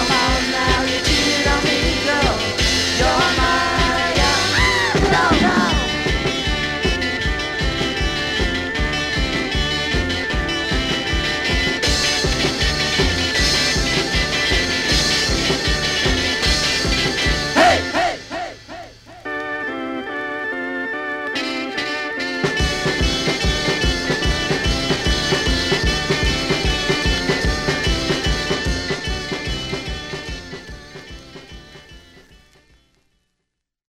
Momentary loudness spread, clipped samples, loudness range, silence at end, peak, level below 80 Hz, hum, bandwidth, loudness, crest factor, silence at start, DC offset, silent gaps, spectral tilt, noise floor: 10 LU; under 0.1%; 8 LU; 1.8 s; -2 dBFS; -28 dBFS; none; 16 kHz; -18 LUFS; 16 dB; 0 s; under 0.1%; none; -3.5 dB/octave; -77 dBFS